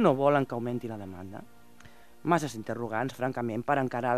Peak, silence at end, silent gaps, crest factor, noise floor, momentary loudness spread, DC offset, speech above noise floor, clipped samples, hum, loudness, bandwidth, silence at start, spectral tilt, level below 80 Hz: -8 dBFS; 0 s; none; 22 dB; -56 dBFS; 16 LU; 0.3%; 27 dB; under 0.1%; none; -30 LUFS; 14.5 kHz; 0 s; -6.5 dB/octave; -66 dBFS